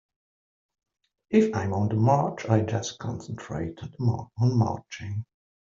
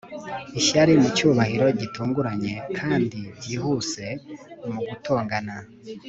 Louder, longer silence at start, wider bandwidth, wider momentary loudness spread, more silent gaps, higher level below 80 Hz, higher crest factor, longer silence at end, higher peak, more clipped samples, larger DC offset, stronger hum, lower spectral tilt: second, -27 LUFS vs -23 LUFS; first, 1.3 s vs 0.05 s; about the same, 7.6 kHz vs 8.2 kHz; second, 13 LU vs 18 LU; neither; about the same, -60 dBFS vs -56 dBFS; about the same, 20 dB vs 18 dB; first, 0.55 s vs 0 s; about the same, -6 dBFS vs -4 dBFS; neither; neither; neither; first, -7 dB/octave vs -5 dB/octave